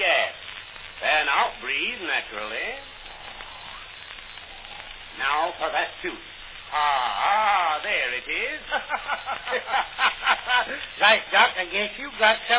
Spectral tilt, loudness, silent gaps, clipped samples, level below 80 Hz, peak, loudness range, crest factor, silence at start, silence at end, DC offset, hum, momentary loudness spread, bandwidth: -5 dB/octave; -23 LUFS; none; under 0.1%; -56 dBFS; -4 dBFS; 9 LU; 22 dB; 0 s; 0 s; under 0.1%; none; 18 LU; 4 kHz